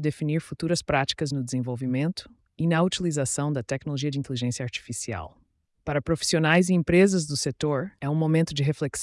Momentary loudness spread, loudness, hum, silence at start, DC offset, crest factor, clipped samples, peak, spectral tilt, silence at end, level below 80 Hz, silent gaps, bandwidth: 11 LU; -25 LUFS; none; 0 s; under 0.1%; 16 dB; under 0.1%; -8 dBFS; -5 dB/octave; 0 s; -54 dBFS; none; 12 kHz